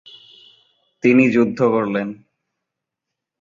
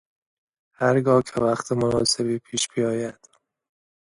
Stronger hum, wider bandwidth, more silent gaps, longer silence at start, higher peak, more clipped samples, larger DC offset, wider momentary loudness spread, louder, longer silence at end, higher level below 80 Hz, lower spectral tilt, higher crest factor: neither; second, 7.4 kHz vs 11.5 kHz; neither; first, 1.05 s vs 0.8 s; first, -2 dBFS vs -6 dBFS; neither; neither; first, 10 LU vs 6 LU; first, -17 LUFS vs -23 LUFS; first, 1.3 s vs 1.05 s; second, -62 dBFS vs -56 dBFS; first, -7.5 dB/octave vs -4.5 dB/octave; about the same, 18 dB vs 18 dB